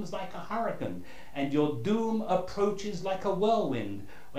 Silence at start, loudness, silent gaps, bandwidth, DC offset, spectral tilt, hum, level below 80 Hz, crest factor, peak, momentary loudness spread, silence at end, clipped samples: 0 s; -31 LUFS; none; 15.5 kHz; 1%; -6.5 dB/octave; none; -58 dBFS; 16 dB; -14 dBFS; 12 LU; 0 s; under 0.1%